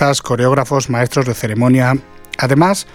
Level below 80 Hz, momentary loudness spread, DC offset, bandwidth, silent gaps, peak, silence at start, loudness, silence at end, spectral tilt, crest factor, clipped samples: -46 dBFS; 7 LU; under 0.1%; 16.5 kHz; none; 0 dBFS; 0 s; -14 LUFS; 0.1 s; -5.5 dB/octave; 14 dB; under 0.1%